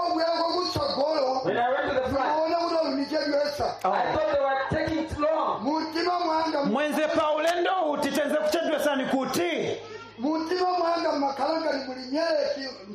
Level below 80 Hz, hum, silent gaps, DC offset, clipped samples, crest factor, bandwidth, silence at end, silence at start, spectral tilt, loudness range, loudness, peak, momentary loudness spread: -54 dBFS; none; none; under 0.1%; under 0.1%; 12 dB; 13 kHz; 0 s; 0 s; -4.5 dB/octave; 2 LU; -26 LUFS; -12 dBFS; 4 LU